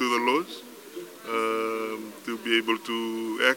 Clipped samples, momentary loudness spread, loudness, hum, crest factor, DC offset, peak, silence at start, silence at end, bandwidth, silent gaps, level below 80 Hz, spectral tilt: under 0.1%; 17 LU; -27 LUFS; none; 22 dB; under 0.1%; -6 dBFS; 0 s; 0 s; 17 kHz; none; -88 dBFS; -2.5 dB/octave